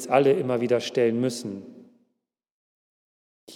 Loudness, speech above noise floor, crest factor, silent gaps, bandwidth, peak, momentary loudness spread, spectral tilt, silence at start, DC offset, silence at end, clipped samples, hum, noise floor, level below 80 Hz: -24 LUFS; 56 dB; 20 dB; 2.51-3.47 s; 15 kHz; -6 dBFS; 15 LU; -5.5 dB/octave; 0 s; under 0.1%; 0 s; under 0.1%; none; -79 dBFS; -88 dBFS